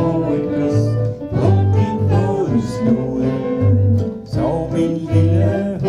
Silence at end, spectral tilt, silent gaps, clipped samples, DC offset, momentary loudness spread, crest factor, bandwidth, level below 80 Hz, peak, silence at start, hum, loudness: 0 s; -9 dB/octave; none; under 0.1%; under 0.1%; 5 LU; 14 dB; 9.8 kHz; -40 dBFS; -2 dBFS; 0 s; none; -17 LUFS